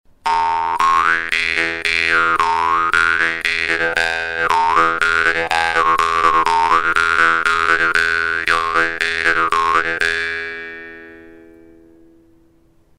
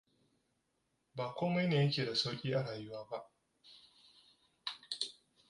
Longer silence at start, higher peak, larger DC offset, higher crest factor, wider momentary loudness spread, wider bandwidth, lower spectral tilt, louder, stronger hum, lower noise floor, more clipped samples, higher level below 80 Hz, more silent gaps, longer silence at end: second, 0.25 s vs 1.15 s; first, 0 dBFS vs -18 dBFS; neither; about the same, 18 dB vs 20 dB; second, 5 LU vs 15 LU; first, 16 kHz vs 11.5 kHz; second, -2 dB/octave vs -5.5 dB/octave; first, -15 LUFS vs -37 LUFS; neither; second, -53 dBFS vs -81 dBFS; neither; first, -46 dBFS vs -78 dBFS; neither; first, 1.6 s vs 0.4 s